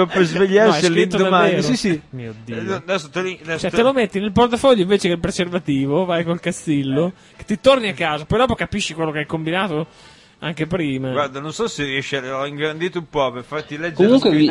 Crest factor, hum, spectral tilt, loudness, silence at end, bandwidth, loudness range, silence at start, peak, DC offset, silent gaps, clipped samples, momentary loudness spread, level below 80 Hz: 18 dB; none; -5.5 dB/octave; -19 LUFS; 0 s; 11.5 kHz; 5 LU; 0 s; 0 dBFS; under 0.1%; none; under 0.1%; 11 LU; -46 dBFS